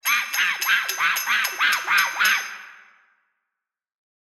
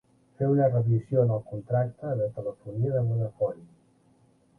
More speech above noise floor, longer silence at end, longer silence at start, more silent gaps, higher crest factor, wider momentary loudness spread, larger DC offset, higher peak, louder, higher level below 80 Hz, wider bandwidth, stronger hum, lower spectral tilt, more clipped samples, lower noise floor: first, 62 dB vs 36 dB; first, 1.65 s vs 0.95 s; second, 0.05 s vs 0.4 s; neither; about the same, 18 dB vs 18 dB; second, 4 LU vs 9 LU; neither; first, -6 dBFS vs -10 dBFS; first, -20 LUFS vs -27 LUFS; second, -80 dBFS vs -60 dBFS; first, 19 kHz vs 2.2 kHz; neither; second, 3 dB/octave vs -12 dB/octave; neither; first, -84 dBFS vs -63 dBFS